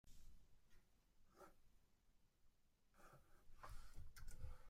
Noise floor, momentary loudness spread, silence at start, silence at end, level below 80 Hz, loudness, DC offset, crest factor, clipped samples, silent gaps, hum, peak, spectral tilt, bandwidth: -77 dBFS; 8 LU; 0.05 s; 0 s; -64 dBFS; -64 LUFS; under 0.1%; 18 dB; under 0.1%; none; none; -40 dBFS; -4.5 dB/octave; 16 kHz